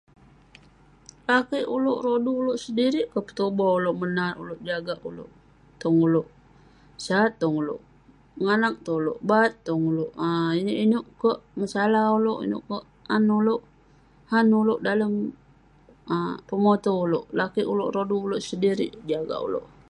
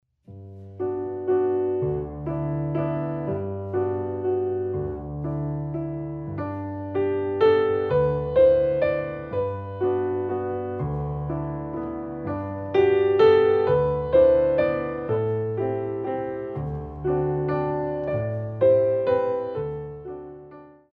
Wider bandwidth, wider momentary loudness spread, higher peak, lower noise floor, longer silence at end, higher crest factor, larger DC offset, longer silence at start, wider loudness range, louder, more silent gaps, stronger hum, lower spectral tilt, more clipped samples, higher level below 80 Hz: first, 11 kHz vs 4.9 kHz; second, 10 LU vs 13 LU; about the same, -8 dBFS vs -6 dBFS; first, -56 dBFS vs -46 dBFS; about the same, 0.25 s vs 0.25 s; about the same, 18 dB vs 18 dB; neither; first, 1.3 s vs 0.3 s; second, 3 LU vs 8 LU; about the same, -25 LUFS vs -24 LUFS; neither; neither; second, -6.5 dB/octave vs -10 dB/octave; neither; second, -62 dBFS vs -46 dBFS